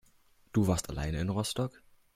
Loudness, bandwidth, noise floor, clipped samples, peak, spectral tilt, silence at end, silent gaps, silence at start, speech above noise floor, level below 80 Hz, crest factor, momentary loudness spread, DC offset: -33 LUFS; 16 kHz; -64 dBFS; under 0.1%; -16 dBFS; -5.5 dB/octave; 0.45 s; none; 0.55 s; 33 dB; -48 dBFS; 18 dB; 7 LU; under 0.1%